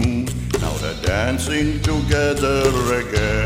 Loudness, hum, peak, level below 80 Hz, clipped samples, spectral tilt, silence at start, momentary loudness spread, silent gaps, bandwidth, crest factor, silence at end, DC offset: -20 LUFS; none; -6 dBFS; -28 dBFS; under 0.1%; -5 dB/octave; 0 s; 5 LU; none; 16 kHz; 14 dB; 0 s; under 0.1%